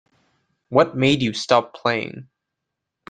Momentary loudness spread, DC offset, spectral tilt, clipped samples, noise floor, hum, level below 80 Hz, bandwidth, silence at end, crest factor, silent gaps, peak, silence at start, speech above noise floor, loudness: 11 LU; under 0.1%; -5.5 dB/octave; under 0.1%; -82 dBFS; none; -58 dBFS; 9.4 kHz; 0.85 s; 20 dB; none; -2 dBFS; 0.7 s; 62 dB; -20 LUFS